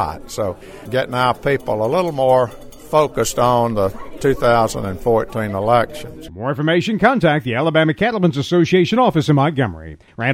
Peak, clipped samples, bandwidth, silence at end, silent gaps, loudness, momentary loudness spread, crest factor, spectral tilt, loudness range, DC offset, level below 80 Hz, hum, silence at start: 0 dBFS; under 0.1%; 16.5 kHz; 0 s; none; -17 LUFS; 10 LU; 16 dB; -6 dB/octave; 3 LU; under 0.1%; -40 dBFS; none; 0 s